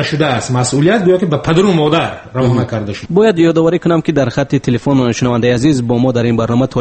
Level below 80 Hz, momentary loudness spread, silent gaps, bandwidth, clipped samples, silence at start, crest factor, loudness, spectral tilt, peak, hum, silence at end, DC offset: -42 dBFS; 5 LU; none; 8.8 kHz; under 0.1%; 0 s; 12 dB; -13 LUFS; -6.5 dB/octave; 0 dBFS; none; 0 s; under 0.1%